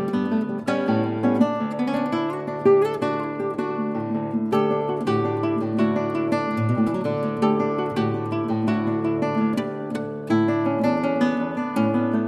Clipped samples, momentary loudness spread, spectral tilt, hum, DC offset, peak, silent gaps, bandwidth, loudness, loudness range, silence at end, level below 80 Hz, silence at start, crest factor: under 0.1%; 6 LU; -8 dB/octave; none; under 0.1%; -6 dBFS; none; 11 kHz; -23 LUFS; 1 LU; 0 s; -64 dBFS; 0 s; 16 dB